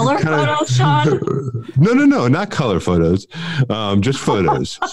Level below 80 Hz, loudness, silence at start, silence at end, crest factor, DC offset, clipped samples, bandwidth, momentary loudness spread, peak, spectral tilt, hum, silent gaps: -46 dBFS; -16 LUFS; 0 s; 0 s; 12 dB; 0.7%; under 0.1%; 11.5 kHz; 8 LU; -4 dBFS; -6.5 dB/octave; none; none